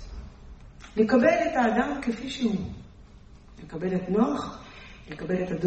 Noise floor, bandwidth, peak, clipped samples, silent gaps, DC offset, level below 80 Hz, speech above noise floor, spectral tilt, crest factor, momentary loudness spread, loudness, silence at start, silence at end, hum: -49 dBFS; 8.4 kHz; -8 dBFS; under 0.1%; none; under 0.1%; -48 dBFS; 24 dB; -6.5 dB/octave; 20 dB; 24 LU; -26 LUFS; 0 s; 0 s; none